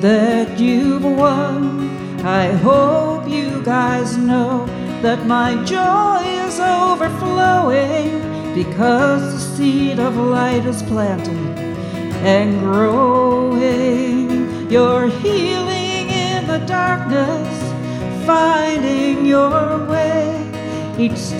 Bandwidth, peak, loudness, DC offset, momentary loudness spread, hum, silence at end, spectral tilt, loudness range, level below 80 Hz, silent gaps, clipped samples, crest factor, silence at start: 13 kHz; -2 dBFS; -16 LUFS; under 0.1%; 9 LU; none; 0 s; -6 dB/octave; 2 LU; -48 dBFS; none; under 0.1%; 12 dB; 0 s